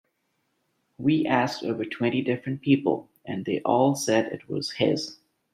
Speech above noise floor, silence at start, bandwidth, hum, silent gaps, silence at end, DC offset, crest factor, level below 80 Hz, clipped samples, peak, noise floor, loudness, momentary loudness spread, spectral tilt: 50 dB; 1 s; 14 kHz; none; none; 0.4 s; under 0.1%; 20 dB; -68 dBFS; under 0.1%; -6 dBFS; -74 dBFS; -26 LUFS; 9 LU; -5.5 dB/octave